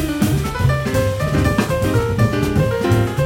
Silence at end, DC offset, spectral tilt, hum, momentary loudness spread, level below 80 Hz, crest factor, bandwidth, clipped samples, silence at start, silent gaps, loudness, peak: 0 s; under 0.1%; -6.5 dB/octave; none; 2 LU; -30 dBFS; 14 dB; 17.5 kHz; under 0.1%; 0 s; none; -18 LUFS; -4 dBFS